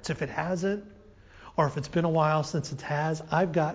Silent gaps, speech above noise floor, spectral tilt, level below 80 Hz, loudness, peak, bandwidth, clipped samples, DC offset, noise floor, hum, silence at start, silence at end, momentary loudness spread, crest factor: none; 24 dB; -6.5 dB/octave; -56 dBFS; -29 LUFS; -10 dBFS; 8 kHz; under 0.1%; under 0.1%; -52 dBFS; none; 0 s; 0 s; 7 LU; 18 dB